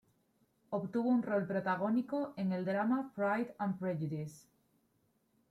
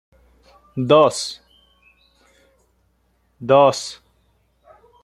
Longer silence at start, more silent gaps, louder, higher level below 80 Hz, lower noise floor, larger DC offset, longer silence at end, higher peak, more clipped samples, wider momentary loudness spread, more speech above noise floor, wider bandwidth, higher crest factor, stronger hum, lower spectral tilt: about the same, 0.7 s vs 0.75 s; neither; second, -36 LUFS vs -17 LUFS; second, -78 dBFS vs -60 dBFS; first, -76 dBFS vs -64 dBFS; neither; about the same, 1.1 s vs 1.1 s; second, -22 dBFS vs -2 dBFS; neither; second, 8 LU vs 19 LU; second, 41 dB vs 48 dB; about the same, 13 kHz vs 13 kHz; second, 14 dB vs 20 dB; neither; first, -8.5 dB/octave vs -5 dB/octave